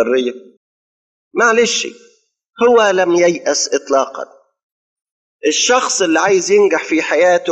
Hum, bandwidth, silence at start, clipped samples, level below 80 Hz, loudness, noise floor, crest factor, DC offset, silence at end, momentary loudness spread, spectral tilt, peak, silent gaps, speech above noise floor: none; 10.5 kHz; 0 s; under 0.1%; -62 dBFS; -14 LUFS; under -90 dBFS; 14 dB; under 0.1%; 0 s; 11 LU; -2 dB/octave; 0 dBFS; 0.57-1.31 s, 4.63-4.96 s, 5.11-5.39 s; over 76 dB